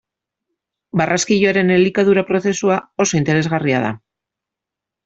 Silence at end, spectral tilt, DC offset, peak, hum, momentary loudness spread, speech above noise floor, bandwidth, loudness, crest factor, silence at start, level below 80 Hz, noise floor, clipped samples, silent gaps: 1.1 s; -5 dB/octave; under 0.1%; -2 dBFS; none; 6 LU; 69 dB; 8 kHz; -16 LUFS; 16 dB; 0.95 s; -54 dBFS; -85 dBFS; under 0.1%; none